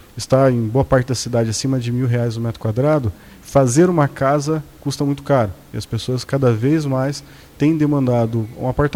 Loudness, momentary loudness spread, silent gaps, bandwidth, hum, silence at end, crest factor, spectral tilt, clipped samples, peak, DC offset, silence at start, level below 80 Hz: -18 LUFS; 9 LU; none; 16 kHz; none; 0 s; 14 dB; -6.5 dB/octave; under 0.1%; -4 dBFS; under 0.1%; 0.15 s; -42 dBFS